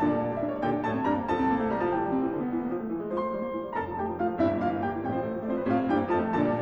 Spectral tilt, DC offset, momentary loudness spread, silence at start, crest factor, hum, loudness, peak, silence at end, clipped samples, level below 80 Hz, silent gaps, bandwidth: -9 dB/octave; under 0.1%; 6 LU; 0 s; 14 dB; none; -29 LUFS; -14 dBFS; 0 s; under 0.1%; -54 dBFS; none; 6.8 kHz